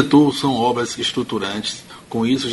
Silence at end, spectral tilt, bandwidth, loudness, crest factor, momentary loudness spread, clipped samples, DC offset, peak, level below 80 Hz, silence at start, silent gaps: 0 s; -5 dB/octave; 11.5 kHz; -19 LUFS; 18 dB; 12 LU; under 0.1%; under 0.1%; 0 dBFS; -54 dBFS; 0 s; none